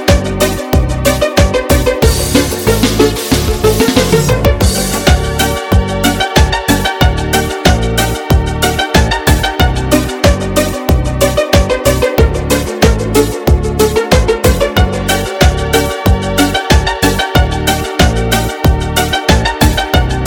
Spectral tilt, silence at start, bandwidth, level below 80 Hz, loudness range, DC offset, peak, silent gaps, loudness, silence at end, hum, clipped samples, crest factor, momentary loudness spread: -4.5 dB/octave; 0 s; 18 kHz; -16 dBFS; 1 LU; under 0.1%; 0 dBFS; none; -11 LUFS; 0 s; none; 0.3%; 10 dB; 3 LU